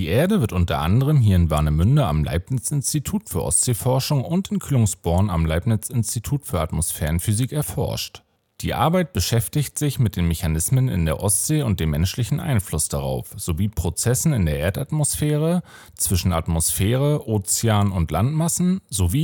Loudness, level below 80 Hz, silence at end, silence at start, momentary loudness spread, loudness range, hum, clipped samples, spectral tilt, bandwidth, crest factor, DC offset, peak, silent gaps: -21 LUFS; -38 dBFS; 0 s; 0 s; 6 LU; 3 LU; none; under 0.1%; -5 dB/octave; 17.5 kHz; 16 dB; under 0.1%; -4 dBFS; none